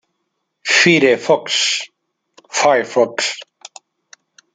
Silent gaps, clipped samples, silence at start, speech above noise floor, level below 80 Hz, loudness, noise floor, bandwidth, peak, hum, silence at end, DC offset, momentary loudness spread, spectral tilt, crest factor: none; under 0.1%; 0.65 s; 57 dB; -66 dBFS; -15 LUFS; -72 dBFS; 9.6 kHz; 0 dBFS; none; 1.1 s; under 0.1%; 14 LU; -2.5 dB/octave; 18 dB